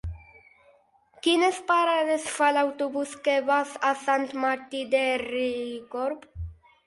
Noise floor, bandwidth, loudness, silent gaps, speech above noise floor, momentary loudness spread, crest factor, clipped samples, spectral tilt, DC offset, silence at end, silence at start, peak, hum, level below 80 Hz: -61 dBFS; 11.5 kHz; -26 LUFS; none; 36 dB; 13 LU; 18 dB; under 0.1%; -4 dB/octave; under 0.1%; 0.35 s; 0.05 s; -8 dBFS; none; -50 dBFS